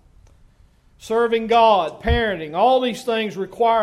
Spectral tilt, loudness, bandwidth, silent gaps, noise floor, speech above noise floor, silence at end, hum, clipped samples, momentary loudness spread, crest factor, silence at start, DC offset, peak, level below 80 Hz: -5.5 dB/octave; -19 LUFS; 13.5 kHz; none; -53 dBFS; 35 dB; 0 s; none; under 0.1%; 8 LU; 16 dB; 1.05 s; under 0.1%; -4 dBFS; -36 dBFS